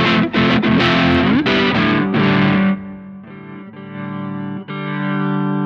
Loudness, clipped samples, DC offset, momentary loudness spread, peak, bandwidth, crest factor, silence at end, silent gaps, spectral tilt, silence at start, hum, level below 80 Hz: -16 LUFS; under 0.1%; under 0.1%; 20 LU; -4 dBFS; 7 kHz; 14 dB; 0 s; none; -7 dB/octave; 0 s; none; -44 dBFS